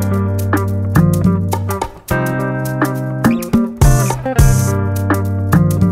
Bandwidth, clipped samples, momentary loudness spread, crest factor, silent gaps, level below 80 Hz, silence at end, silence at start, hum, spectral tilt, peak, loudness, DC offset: 16.5 kHz; under 0.1%; 6 LU; 14 dB; none; -24 dBFS; 0 s; 0 s; none; -6.5 dB/octave; 0 dBFS; -15 LUFS; under 0.1%